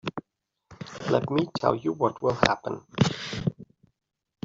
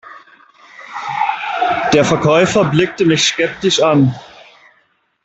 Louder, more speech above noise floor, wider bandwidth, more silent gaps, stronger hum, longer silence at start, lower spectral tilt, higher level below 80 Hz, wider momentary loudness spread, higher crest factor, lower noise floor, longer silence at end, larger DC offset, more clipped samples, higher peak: second, -27 LUFS vs -14 LUFS; about the same, 49 dB vs 46 dB; about the same, 7.8 kHz vs 8.4 kHz; neither; neither; about the same, 0.05 s vs 0.05 s; first, -6 dB/octave vs -4.5 dB/octave; second, -56 dBFS vs -50 dBFS; first, 12 LU vs 9 LU; first, 24 dB vs 16 dB; first, -74 dBFS vs -59 dBFS; second, 0.8 s vs 1 s; neither; neither; second, -4 dBFS vs 0 dBFS